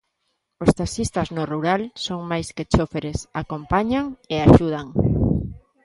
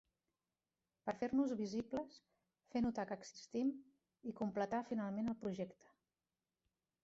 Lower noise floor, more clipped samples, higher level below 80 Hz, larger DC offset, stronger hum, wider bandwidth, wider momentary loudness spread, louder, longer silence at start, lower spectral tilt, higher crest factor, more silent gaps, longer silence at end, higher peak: second, -74 dBFS vs under -90 dBFS; neither; first, -34 dBFS vs -74 dBFS; neither; neither; first, 11.5 kHz vs 7.8 kHz; about the same, 13 LU vs 11 LU; first, -22 LUFS vs -43 LUFS; second, 0.6 s vs 1.05 s; about the same, -6.5 dB/octave vs -6 dB/octave; about the same, 20 dB vs 18 dB; neither; second, 0.25 s vs 1.3 s; first, 0 dBFS vs -26 dBFS